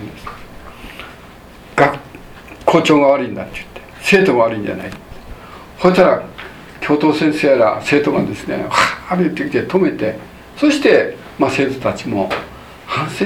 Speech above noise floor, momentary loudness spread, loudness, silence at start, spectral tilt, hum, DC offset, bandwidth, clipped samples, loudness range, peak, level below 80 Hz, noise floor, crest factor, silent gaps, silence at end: 24 dB; 23 LU; -15 LUFS; 0 s; -5.5 dB/octave; none; under 0.1%; 16 kHz; under 0.1%; 2 LU; 0 dBFS; -44 dBFS; -38 dBFS; 16 dB; none; 0 s